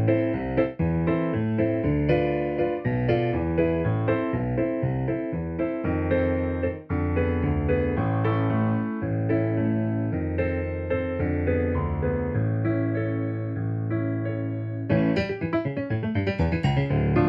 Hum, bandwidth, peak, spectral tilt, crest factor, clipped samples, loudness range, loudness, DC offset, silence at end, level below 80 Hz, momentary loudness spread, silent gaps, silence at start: none; 5.4 kHz; -8 dBFS; -10 dB/octave; 16 dB; under 0.1%; 2 LU; -26 LUFS; under 0.1%; 0 s; -40 dBFS; 5 LU; none; 0 s